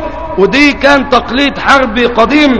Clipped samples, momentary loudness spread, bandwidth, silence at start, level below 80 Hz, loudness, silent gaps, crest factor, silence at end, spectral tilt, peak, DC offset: 2%; 5 LU; 11 kHz; 0 s; -30 dBFS; -8 LUFS; none; 8 dB; 0 s; -4.5 dB/octave; 0 dBFS; 2%